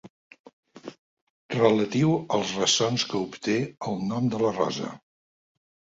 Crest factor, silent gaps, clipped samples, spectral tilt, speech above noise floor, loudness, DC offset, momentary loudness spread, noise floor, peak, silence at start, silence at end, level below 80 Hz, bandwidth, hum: 22 dB; 0.10-0.31 s, 0.39-0.44 s, 0.53-0.63 s, 0.99-1.49 s; under 0.1%; -4.5 dB/octave; over 65 dB; -25 LUFS; under 0.1%; 16 LU; under -90 dBFS; -6 dBFS; 0.05 s; 1 s; -64 dBFS; 8 kHz; none